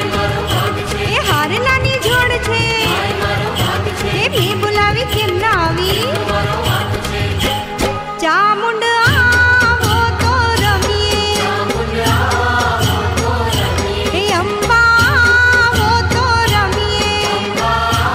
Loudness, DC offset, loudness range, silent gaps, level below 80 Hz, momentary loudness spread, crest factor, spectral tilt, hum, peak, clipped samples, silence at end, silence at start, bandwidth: -13 LUFS; under 0.1%; 3 LU; none; -30 dBFS; 7 LU; 12 dB; -4 dB/octave; none; -2 dBFS; under 0.1%; 0 s; 0 s; 16 kHz